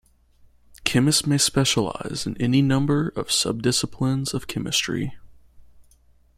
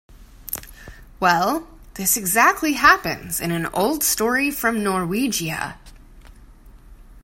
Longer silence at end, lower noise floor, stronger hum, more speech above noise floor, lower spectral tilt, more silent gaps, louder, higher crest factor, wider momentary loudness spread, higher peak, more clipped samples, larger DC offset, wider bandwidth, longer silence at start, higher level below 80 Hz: first, 0.55 s vs 0.05 s; first, -57 dBFS vs -45 dBFS; neither; first, 34 dB vs 25 dB; about the same, -4 dB/octave vs -3 dB/octave; neither; about the same, -22 LUFS vs -20 LUFS; about the same, 22 dB vs 22 dB; second, 9 LU vs 15 LU; about the same, 0 dBFS vs 0 dBFS; neither; neither; about the same, 15.5 kHz vs 16.5 kHz; first, 0.85 s vs 0.15 s; about the same, -50 dBFS vs -46 dBFS